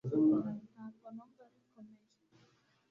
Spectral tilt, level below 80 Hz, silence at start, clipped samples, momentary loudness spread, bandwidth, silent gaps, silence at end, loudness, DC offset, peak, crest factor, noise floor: -11 dB/octave; -76 dBFS; 0.05 s; under 0.1%; 23 LU; 2.4 kHz; none; 1.05 s; -33 LUFS; under 0.1%; -22 dBFS; 16 dB; -71 dBFS